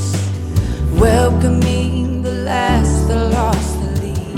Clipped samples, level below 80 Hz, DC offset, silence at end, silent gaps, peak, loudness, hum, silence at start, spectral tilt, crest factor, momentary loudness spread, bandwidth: under 0.1%; -22 dBFS; under 0.1%; 0 s; none; 0 dBFS; -16 LUFS; none; 0 s; -6.5 dB/octave; 14 dB; 7 LU; 15.5 kHz